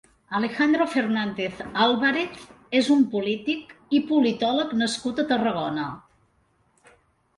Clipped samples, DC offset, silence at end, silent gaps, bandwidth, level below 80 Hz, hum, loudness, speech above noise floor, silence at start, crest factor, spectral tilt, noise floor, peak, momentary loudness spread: under 0.1%; under 0.1%; 1.4 s; none; 11.5 kHz; -62 dBFS; none; -24 LUFS; 42 dB; 0.3 s; 18 dB; -4.5 dB/octave; -65 dBFS; -6 dBFS; 10 LU